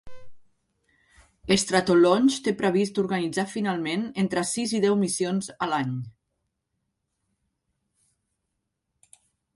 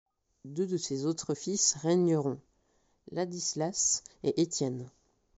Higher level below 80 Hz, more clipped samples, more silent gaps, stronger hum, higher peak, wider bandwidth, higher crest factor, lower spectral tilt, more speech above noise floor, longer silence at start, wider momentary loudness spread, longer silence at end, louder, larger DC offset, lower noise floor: first, -62 dBFS vs -70 dBFS; neither; neither; neither; first, -6 dBFS vs -12 dBFS; first, 11.5 kHz vs 8 kHz; about the same, 20 dB vs 20 dB; second, -4.5 dB/octave vs -6 dB/octave; first, 56 dB vs 41 dB; second, 0.05 s vs 0.45 s; second, 9 LU vs 13 LU; first, 3.45 s vs 0.5 s; first, -24 LUFS vs -30 LUFS; neither; first, -80 dBFS vs -72 dBFS